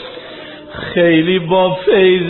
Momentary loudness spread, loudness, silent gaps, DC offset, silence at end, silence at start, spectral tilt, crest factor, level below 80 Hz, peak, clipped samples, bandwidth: 19 LU; -13 LUFS; none; under 0.1%; 0 s; 0 s; -4 dB/octave; 12 dB; -48 dBFS; -2 dBFS; under 0.1%; 4.2 kHz